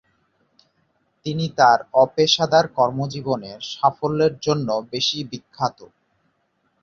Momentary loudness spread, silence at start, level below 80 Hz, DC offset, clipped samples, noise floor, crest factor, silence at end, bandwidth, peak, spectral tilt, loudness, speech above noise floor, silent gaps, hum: 11 LU; 1.25 s; -60 dBFS; under 0.1%; under 0.1%; -68 dBFS; 20 dB; 1 s; 7.6 kHz; -2 dBFS; -4.5 dB/octave; -20 LUFS; 48 dB; none; none